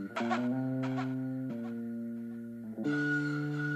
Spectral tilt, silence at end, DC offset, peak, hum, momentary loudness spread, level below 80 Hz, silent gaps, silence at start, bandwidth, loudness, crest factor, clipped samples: -7.5 dB/octave; 0 s; under 0.1%; -18 dBFS; none; 10 LU; -76 dBFS; none; 0 s; 13.5 kHz; -35 LUFS; 16 dB; under 0.1%